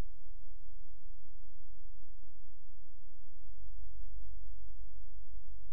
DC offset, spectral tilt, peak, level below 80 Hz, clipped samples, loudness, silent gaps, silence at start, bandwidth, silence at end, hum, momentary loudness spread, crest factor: 5%; -8 dB/octave; -22 dBFS; -50 dBFS; under 0.1%; -59 LUFS; none; 0 s; 2.9 kHz; 0 s; none; 10 LU; 12 dB